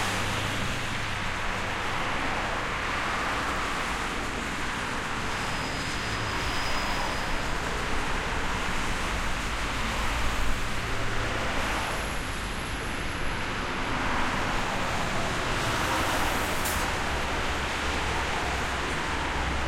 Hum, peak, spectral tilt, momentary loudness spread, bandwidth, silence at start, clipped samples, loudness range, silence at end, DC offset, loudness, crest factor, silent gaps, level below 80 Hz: none; -12 dBFS; -3.5 dB/octave; 3 LU; 16.5 kHz; 0 s; under 0.1%; 2 LU; 0 s; under 0.1%; -29 LUFS; 16 dB; none; -36 dBFS